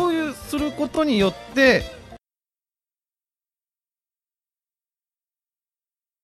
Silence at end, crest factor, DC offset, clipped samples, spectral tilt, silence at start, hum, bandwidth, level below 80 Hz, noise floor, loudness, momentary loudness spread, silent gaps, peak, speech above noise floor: 4.05 s; 22 dB; under 0.1%; under 0.1%; -5 dB/octave; 0 s; none; 14.5 kHz; -48 dBFS; under -90 dBFS; -21 LUFS; 10 LU; none; -4 dBFS; over 70 dB